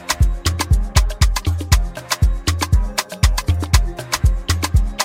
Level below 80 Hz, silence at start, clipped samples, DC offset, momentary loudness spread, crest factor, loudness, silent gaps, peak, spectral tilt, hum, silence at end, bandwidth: -20 dBFS; 0 s; under 0.1%; under 0.1%; 4 LU; 16 dB; -19 LUFS; none; 0 dBFS; -4 dB/octave; none; 0 s; 16.5 kHz